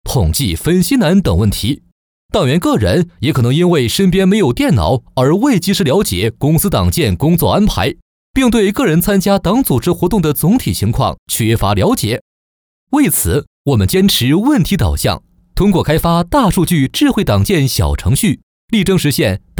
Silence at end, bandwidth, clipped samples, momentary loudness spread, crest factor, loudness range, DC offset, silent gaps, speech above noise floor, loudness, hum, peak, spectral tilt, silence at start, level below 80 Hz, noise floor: 0 s; over 20 kHz; under 0.1%; 6 LU; 10 dB; 2 LU; under 0.1%; 1.92-2.29 s, 8.02-8.34 s, 11.18-11.26 s, 12.21-12.87 s, 13.47-13.65 s, 18.43-18.68 s; over 78 dB; -13 LUFS; none; -2 dBFS; -5.5 dB/octave; 0.05 s; -28 dBFS; under -90 dBFS